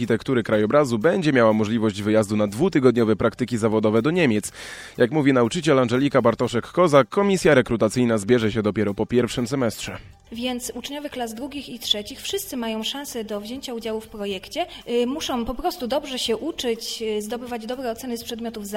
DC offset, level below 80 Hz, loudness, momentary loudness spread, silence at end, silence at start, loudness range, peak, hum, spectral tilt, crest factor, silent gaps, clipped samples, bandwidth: under 0.1%; -50 dBFS; -22 LUFS; 12 LU; 0 s; 0 s; 8 LU; -2 dBFS; none; -5.5 dB/octave; 20 dB; none; under 0.1%; 16.5 kHz